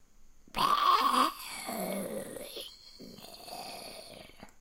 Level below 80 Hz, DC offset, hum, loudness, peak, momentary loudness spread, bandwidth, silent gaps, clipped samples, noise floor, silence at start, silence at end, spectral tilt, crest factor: -60 dBFS; under 0.1%; none; -31 LUFS; -14 dBFS; 24 LU; 16 kHz; none; under 0.1%; -55 dBFS; 0 s; 0.1 s; -2.5 dB/octave; 20 dB